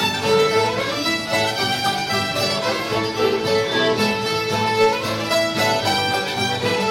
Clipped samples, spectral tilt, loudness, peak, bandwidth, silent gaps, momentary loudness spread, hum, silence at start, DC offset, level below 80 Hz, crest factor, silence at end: under 0.1%; -3.5 dB/octave; -19 LUFS; -6 dBFS; 16.5 kHz; none; 4 LU; none; 0 s; under 0.1%; -54 dBFS; 12 dB; 0 s